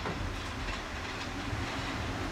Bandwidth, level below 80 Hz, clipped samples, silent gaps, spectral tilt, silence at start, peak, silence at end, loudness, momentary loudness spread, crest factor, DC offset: 16 kHz; -44 dBFS; under 0.1%; none; -4.5 dB/octave; 0 s; -22 dBFS; 0 s; -36 LUFS; 2 LU; 14 dB; under 0.1%